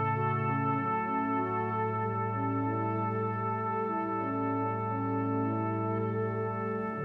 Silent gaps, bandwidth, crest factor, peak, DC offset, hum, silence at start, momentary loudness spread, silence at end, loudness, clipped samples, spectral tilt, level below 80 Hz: none; 4.2 kHz; 12 dB; -18 dBFS; under 0.1%; none; 0 s; 2 LU; 0 s; -31 LUFS; under 0.1%; -10.5 dB/octave; -70 dBFS